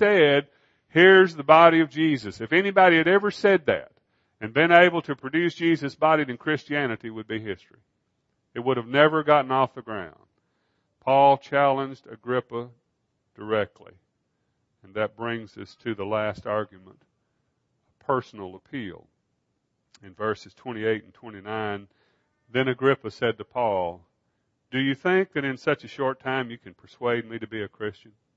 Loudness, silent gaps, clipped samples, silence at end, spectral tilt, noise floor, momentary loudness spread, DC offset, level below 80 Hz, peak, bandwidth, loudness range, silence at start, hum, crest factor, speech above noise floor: -23 LUFS; none; under 0.1%; 0.45 s; -6.5 dB/octave; -75 dBFS; 19 LU; under 0.1%; -68 dBFS; 0 dBFS; 7.8 kHz; 13 LU; 0 s; none; 24 dB; 52 dB